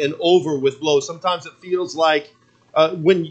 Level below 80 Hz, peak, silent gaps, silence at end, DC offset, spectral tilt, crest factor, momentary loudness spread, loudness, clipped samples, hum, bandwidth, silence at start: -72 dBFS; -2 dBFS; none; 0 s; under 0.1%; -5 dB/octave; 18 dB; 8 LU; -19 LUFS; under 0.1%; none; 8.4 kHz; 0 s